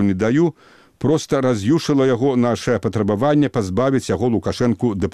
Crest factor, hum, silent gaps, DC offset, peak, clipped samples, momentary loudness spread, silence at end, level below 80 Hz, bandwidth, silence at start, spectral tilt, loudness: 12 dB; none; none; 0.3%; -6 dBFS; under 0.1%; 4 LU; 0 s; -48 dBFS; 13 kHz; 0 s; -7 dB/octave; -18 LUFS